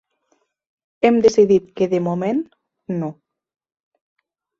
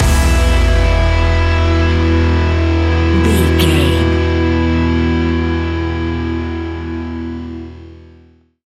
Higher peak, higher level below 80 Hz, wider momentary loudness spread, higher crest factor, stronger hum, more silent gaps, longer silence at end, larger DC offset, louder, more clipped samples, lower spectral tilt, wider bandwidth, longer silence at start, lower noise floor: about the same, -2 dBFS vs 0 dBFS; second, -60 dBFS vs -18 dBFS; first, 14 LU vs 11 LU; about the same, 18 dB vs 14 dB; neither; neither; first, 1.5 s vs 0.65 s; neither; second, -18 LUFS vs -14 LUFS; neither; about the same, -6.5 dB/octave vs -6.5 dB/octave; second, 7.8 kHz vs 14 kHz; first, 1.05 s vs 0 s; first, -67 dBFS vs -46 dBFS